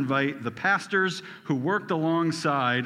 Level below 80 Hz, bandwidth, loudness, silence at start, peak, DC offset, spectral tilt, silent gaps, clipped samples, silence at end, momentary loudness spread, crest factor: -74 dBFS; 13 kHz; -26 LUFS; 0 s; -10 dBFS; under 0.1%; -5.5 dB/octave; none; under 0.1%; 0 s; 5 LU; 16 dB